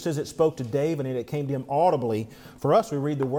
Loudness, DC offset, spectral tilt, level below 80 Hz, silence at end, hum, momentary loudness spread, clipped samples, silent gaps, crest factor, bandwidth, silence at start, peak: -26 LUFS; under 0.1%; -7 dB/octave; -60 dBFS; 0 s; none; 7 LU; under 0.1%; none; 16 dB; 17.5 kHz; 0 s; -10 dBFS